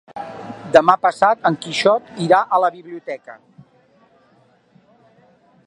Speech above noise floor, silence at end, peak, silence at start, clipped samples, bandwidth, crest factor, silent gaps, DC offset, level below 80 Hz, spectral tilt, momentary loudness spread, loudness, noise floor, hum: 39 dB; 2.3 s; 0 dBFS; 0.15 s; under 0.1%; 11 kHz; 20 dB; none; under 0.1%; -64 dBFS; -5 dB/octave; 19 LU; -16 LUFS; -56 dBFS; none